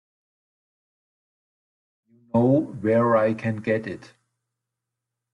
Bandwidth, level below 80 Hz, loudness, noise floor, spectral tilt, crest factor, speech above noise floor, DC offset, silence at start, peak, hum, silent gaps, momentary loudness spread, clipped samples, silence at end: 10 kHz; -66 dBFS; -22 LUFS; -85 dBFS; -9 dB/octave; 18 dB; 63 dB; under 0.1%; 2.35 s; -8 dBFS; none; none; 9 LU; under 0.1%; 1.35 s